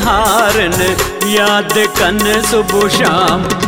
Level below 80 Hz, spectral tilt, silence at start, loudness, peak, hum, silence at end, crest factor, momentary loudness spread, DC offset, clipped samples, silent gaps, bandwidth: -30 dBFS; -3 dB/octave; 0 s; -11 LUFS; 0 dBFS; none; 0 s; 12 dB; 3 LU; 0.2%; under 0.1%; none; 16.5 kHz